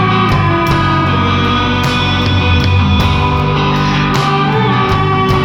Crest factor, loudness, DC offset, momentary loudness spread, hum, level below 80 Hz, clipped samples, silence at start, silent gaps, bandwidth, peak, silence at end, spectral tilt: 10 dB; -12 LUFS; under 0.1%; 1 LU; none; -24 dBFS; under 0.1%; 0 s; none; 15.5 kHz; 0 dBFS; 0 s; -6.5 dB/octave